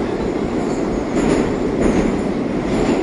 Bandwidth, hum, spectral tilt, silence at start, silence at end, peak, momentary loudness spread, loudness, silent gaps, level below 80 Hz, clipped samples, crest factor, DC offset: 11 kHz; none; -6.5 dB/octave; 0 s; 0 s; -2 dBFS; 4 LU; -19 LUFS; none; -32 dBFS; under 0.1%; 16 dB; under 0.1%